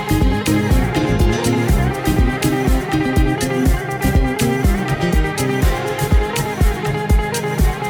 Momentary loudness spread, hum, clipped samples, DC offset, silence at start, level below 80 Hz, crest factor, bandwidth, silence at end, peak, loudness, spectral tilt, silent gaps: 2 LU; none; under 0.1%; under 0.1%; 0 s; -20 dBFS; 12 dB; 18 kHz; 0 s; -4 dBFS; -17 LUFS; -6 dB/octave; none